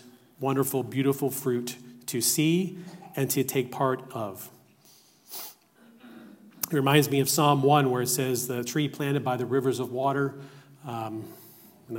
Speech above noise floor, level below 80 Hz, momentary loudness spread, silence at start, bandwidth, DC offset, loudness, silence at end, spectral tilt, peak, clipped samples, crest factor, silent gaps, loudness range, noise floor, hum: 32 dB; -76 dBFS; 17 LU; 0.05 s; 16.5 kHz; under 0.1%; -26 LUFS; 0 s; -4.5 dB/octave; -6 dBFS; under 0.1%; 20 dB; none; 7 LU; -58 dBFS; none